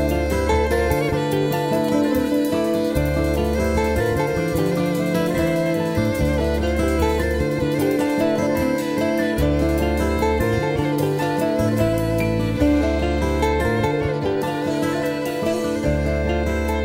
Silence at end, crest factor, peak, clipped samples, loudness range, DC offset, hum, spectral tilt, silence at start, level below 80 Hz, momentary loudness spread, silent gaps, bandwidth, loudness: 0 s; 14 dB; -6 dBFS; under 0.1%; 1 LU; under 0.1%; none; -6.5 dB/octave; 0 s; -30 dBFS; 2 LU; none; 16 kHz; -20 LUFS